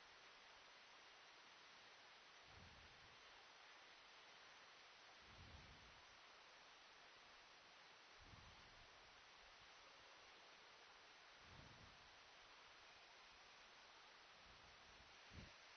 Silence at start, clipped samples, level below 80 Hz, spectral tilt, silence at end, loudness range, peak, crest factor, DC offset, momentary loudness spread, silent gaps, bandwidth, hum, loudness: 0 s; under 0.1%; -80 dBFS; -1 dB/octave; 0 s; 1 LU; -46 dBFS; 20 dB; under 0.1%; 2 LU; none; 6.4 kHz; none; -64 LUFS